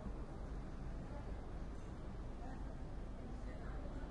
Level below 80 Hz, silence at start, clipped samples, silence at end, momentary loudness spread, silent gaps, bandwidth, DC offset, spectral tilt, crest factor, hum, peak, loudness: -48 dBFS; 0 s; under 0.1%; 0 s; 1 LU; none; 10.5 kHz; under 0.1%; -7.5 dB/octave; 12 dB; none; -34 dBFS; -50 LUFS